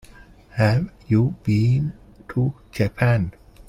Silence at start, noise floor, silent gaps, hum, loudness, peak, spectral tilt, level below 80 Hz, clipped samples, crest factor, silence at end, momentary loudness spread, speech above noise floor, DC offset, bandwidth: 0.55 s; -46 dBFS; none; none; -22 LUFS; -4 dBFS; -8.5 dB/octave; -44 dBFS; under 0.1%; 16 dB; 0.05 s; 10 LU; 26 dB; under 0.1%; 11.5 kHz